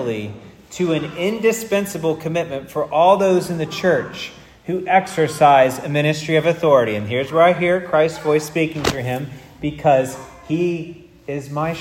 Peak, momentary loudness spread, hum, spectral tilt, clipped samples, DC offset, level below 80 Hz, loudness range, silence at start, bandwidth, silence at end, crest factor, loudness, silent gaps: 0 dBFS; 14 LU; none; -5.5 dB/octave; under 0.1%; under 0.1%; -52 dBFS; 5 LU; 0 s; 16.5 kHz; 0 s; 18 dB; -18 LUFS; none